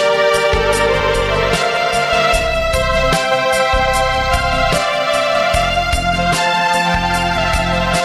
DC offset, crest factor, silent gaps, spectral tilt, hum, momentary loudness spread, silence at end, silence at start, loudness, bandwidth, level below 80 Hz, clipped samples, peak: under 0.1%; 12 dB; none; -3.5 dB/octave; none; 2 LU; 0 s; 0 s; -14 LUFS; 15.5 kHz; -26 dBFS; under 0.1%; -2 dBFS